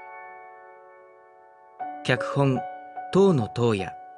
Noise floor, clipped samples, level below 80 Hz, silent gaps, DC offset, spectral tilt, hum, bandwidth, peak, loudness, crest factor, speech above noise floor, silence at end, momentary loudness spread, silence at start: -52 dBFS; under 0.1%; -64 dBFS; none; under 0.1%; -7 dB/octave; none; 10.5 kHz; -6 dBFS; -24 LUFS; 20 dB; 29 dB; 0 s; 22 LU; 0 s